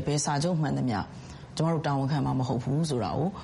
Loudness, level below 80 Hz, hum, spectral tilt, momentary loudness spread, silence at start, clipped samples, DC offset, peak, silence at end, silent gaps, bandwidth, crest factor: -28 LUFS; -52 dBFS; none; -6 dB/octave; 7 LU; 0 s; under 0.1%; under 0.1%; -16 dBFS; 0 s; none; 11.5 kHz; 12 dB